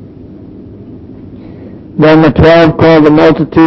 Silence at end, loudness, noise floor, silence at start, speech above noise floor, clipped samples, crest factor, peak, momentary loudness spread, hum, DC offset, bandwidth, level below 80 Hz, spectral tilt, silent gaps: 0 s; -5 LUFS; -30 dBFS; 0 s; 25 dB; 1%; 8 dB; 0 dBFS; 4 LU; none; under 0.1%; 6 kHz; -28 dBFS; -8.5 dB/octave; none